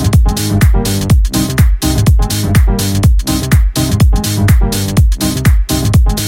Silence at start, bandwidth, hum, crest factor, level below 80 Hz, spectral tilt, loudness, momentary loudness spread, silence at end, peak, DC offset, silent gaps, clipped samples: 0 s; 17 kHz; none; 10 dB; -12 dBFS; -5.5 dB/octave; -12 LUFS; 2 LU; 0 s; 0 dBFS; under 0.1%; none; under 0.1%